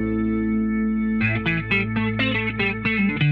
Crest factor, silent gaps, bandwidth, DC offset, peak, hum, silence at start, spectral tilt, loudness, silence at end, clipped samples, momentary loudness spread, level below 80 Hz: 14 dB; none; 5 kHz; under 0.1%; -8 dBFS; none; 0 s; -8.5 dB/octave; -22 LUFS; 0 s; under 0.1%; 2 LU; -40 dBFS